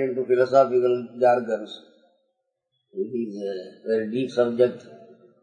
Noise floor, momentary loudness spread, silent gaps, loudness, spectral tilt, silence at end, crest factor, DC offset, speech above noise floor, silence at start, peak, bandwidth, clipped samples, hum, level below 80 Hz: -77 dBFS; 16 LU; none; -23 LUFS; -7 dB/octave; 0.45 s; 20 dB; under 0.1%; 54 dB; 0 s; -4 dBFS; 9.2 kHz; under 0.1%; none; -76 dBFS